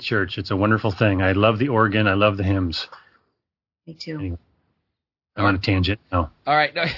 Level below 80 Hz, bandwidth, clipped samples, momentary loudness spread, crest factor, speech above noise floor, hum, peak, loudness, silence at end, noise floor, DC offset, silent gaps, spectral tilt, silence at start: -50 dBFS; 6 kHz; under 0.1%; 14 LU; 20 dB; 63 dB; none; -2 dBFS; -20 LUFS; 0 s; -84 dBFS; under 0.1%; none; -7.5 dB/octave; 0 s